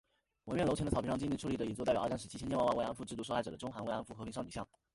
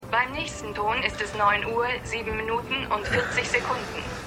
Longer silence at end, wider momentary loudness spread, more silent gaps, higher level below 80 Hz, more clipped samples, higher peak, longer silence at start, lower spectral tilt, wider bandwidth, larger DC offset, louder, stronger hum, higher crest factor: first, 0.3 s vs 0 s; first, 10 LU vs 7 LU; neither; second, -56 dBFS vs -46 dBFS; neither; second, -20 dBFS vs -6 dBFS; first, 0.45 s vs 0 s; first, -6 dB/octave vs -3.5 dB/octave; second, 11.5 kHz vs 16 kHz; neither; second, -38 LUFS vs -26 LUFS; neither; about the same, 18 dB vs 20 dB